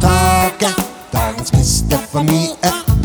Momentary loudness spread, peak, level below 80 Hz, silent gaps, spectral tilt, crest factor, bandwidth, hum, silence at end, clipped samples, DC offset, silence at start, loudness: 7 LU; 0 dBFS; -24 dBFS; none; -4.5 dB/octave; 14 dB; over 20 kHz; none; 0 s; under 0.1%; under 0.1%; 0 s; -15 LUFS